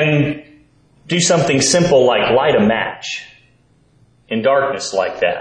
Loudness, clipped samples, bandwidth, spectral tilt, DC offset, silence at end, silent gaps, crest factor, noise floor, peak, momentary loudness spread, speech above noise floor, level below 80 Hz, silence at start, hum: -15 LUFS; under 0.1%; 10.5 kHz; -4 dB/octave; under 0.1%; 0 s; none; 14 dB; -54 dBFS; -2 dBFS; 12 LU; 39 dB; -52 dBFS; 0 s; 60 Hz at -45 dBFS